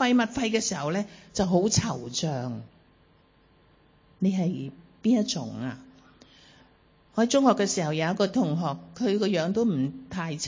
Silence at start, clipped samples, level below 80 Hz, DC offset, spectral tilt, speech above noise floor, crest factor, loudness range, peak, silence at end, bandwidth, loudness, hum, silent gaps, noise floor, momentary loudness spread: 0 s; under 0.1%; -58 dBFS; under 0.1%; -5 dB/octave; 35 dB; 20 dB; 5 LU; -8 dBFS; 0 s; 7.6 kHz; -27 LUFS; none; none; -61 dBFS; 12 LU